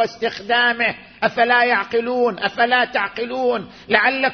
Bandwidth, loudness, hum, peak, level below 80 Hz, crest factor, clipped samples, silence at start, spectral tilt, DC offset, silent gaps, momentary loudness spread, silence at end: 6.6 kHz; -18 LUFS; none; 0 dBFS; -60 dBFS; 18 dB; under 0.1%; 0 s; -4.5 dB/octave; under 0.1%; none; 7 LU; 0 s